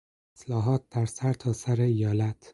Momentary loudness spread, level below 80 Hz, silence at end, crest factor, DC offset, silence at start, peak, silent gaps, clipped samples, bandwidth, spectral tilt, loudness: 6 LU; -56 dBFS; 0.2 s; 14 dB; under 0.1%; 0.4 s; -12 dBFS; none; under 0.1%; 11.5 kHz; -7.5 dB/octave; -28 LUFS